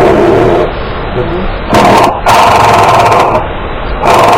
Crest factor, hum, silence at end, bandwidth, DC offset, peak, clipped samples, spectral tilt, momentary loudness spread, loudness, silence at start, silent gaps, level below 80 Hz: 6 dB; none; 0 s; 18 kHz; under 0.1%; 0 dBFS; 3%; -5 dB/octave; 11 LU; -7 LUFS; 0 s; none; -22 dBFS